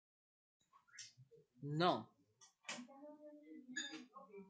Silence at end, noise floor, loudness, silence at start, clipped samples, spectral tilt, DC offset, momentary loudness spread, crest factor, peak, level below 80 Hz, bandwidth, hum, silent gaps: 0 s; -72 dBFS; -44 LUFS; 0.95 s; under 0.1%; -4.5 dB/octave; under 0.1%; 21 LU; 26 dB; -22 dBFS; under -90 dBFS; 9 kHz; none; none